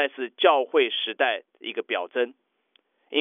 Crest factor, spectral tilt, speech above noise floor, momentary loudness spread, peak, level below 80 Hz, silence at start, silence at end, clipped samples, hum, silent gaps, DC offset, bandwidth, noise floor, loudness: 18 dB; -4.5 dB/octave; 43 dB; 11 LU; -6 dBFS; under -90 dBFS; 0 s; 0 s; under 0.1%; none; none; under 0.1%; 4.8 kHz; -68 dBFS; -25 LUFS